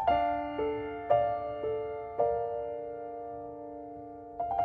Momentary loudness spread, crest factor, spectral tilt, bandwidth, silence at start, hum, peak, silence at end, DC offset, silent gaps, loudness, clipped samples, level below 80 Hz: 15 LU; 20 dB; -8.5 dB/octave; 4.6 kHz; 0 s; none; -12 dBFS; 0 s; under 0.1%; none; -33 LUFS; under 0.1%; -56 dBFS